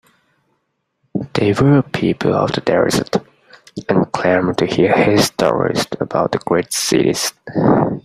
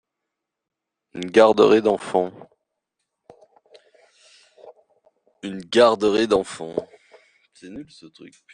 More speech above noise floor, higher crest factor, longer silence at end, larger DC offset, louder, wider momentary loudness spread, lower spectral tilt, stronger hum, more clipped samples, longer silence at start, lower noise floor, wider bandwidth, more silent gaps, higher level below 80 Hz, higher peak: second, 54 dB vs 63 dB; second, 16 dB vs 22 dB; second, 0.05 s vs 0.3 s; neither; first, -16 LUFS vs -19 LUFS; second, 8 LU vs 24 LU; about the same, -5 dB/octave vs -5 dB/octave; neither; neither; about the same, 1.15 s vs 1.15 s; second, -69 dBFS vs -82 dBFS; first, 15.5 kHz vs 10 kHz; neither; first, -48 dBFS vs -64 dBFS; about the same, 0 dBFS vs -2 dBFS